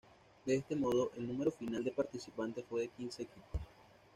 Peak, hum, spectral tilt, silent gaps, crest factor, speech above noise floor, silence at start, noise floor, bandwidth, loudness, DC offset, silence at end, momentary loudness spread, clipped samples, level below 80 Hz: -22 dBFS; none; -6 dB/octave; none; 18 dB; 25 dB; 0.45 s; -63 dBFS; 14.5 kHz; -39 LUFS; under 0.1%; 0.35 s; 12 LU; under 0.1%; -58 dBFS